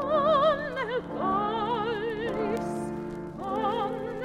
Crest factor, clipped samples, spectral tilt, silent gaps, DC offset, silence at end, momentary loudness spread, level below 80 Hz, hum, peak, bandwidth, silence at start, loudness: 16 dB; under 0.1%; -6 dB/octave; none; under 0.1%; 0 s; 10 LU; -54 dBFS; none; -12 dBFS; 12.5 kHz; 0 s; -28 LUFS